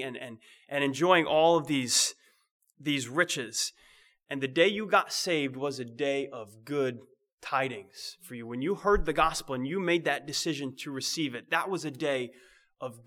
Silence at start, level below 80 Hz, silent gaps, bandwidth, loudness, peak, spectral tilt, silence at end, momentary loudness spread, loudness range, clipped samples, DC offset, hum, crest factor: 0 s; -50 dBFS; 2.51-2.60 s, 7.33-7.38 s; 18 kHz; -29 LUFS; -8 dBFS; -3 dB/octave; 0.05 s; 16 LU; 5 LU; under 0.1%; under 0.1%; none; 22 dB